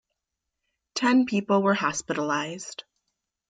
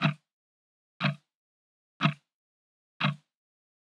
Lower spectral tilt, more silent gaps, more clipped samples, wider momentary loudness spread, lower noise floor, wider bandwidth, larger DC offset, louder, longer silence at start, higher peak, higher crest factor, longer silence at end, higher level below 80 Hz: second, -4.5 dB/octave vs -6.5 dB/octave; second, none vs 0.33-1.00 s, 1.35-2.00 s, 2.34-3.00 s; neither; about the same, 15 LU vs 16 LU; second, -84 dBFS vs under -90 dBFS; first, 9.4 kHz vs 7.4 kHz; neither; first, -25 LUFS vs -31 LUFS; first, 0.95 s vs 0 s; about the same, -10 dBFS vs -10 dBFS; second, 16 dB vs 26 dB; second, 0.7 s vs 0.85 s; first, -68 dBFS vs under -90 dBFS